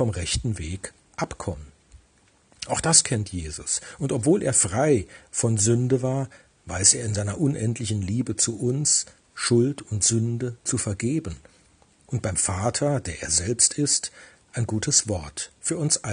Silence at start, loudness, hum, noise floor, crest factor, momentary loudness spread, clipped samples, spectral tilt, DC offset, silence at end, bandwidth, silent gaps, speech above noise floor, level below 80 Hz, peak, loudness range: 0 s; -23 LUFS; none; -61 dBFS; 24 dB; 15 LU; under 0.1%; -3.5 dB/octave; under 0.1%; 0 s; 10.5 kHz; none; 36 dB; -50 dBFS; 0 dBFS; 4 LU